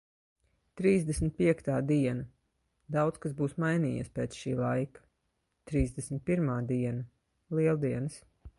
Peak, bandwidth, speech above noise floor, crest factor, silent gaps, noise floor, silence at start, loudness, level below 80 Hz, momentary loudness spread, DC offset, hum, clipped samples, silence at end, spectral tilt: -14 dBFS; 11.5 kHz; 49 dB; 18 dB; none; -79 dBFS; 0.75 s; -31 LUFS; -50 dBFS; 9 LU; under 0.1%; none; under 0.1%; 0.1 s; -7.5 dB/octave